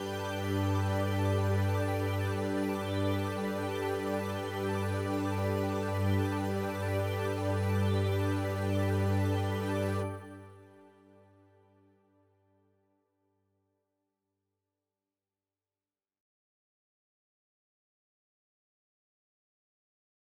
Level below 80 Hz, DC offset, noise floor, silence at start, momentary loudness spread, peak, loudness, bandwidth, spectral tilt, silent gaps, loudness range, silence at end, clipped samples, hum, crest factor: -74 dBFS; under 0.1%; under -90 dBFS; 0 s; 4 LU; -20 dBFS; -32 LUFS; 15 kHz; -7 dB/octave; none; 5 LU; 9.65 s; under 0.1%; none; 14 dB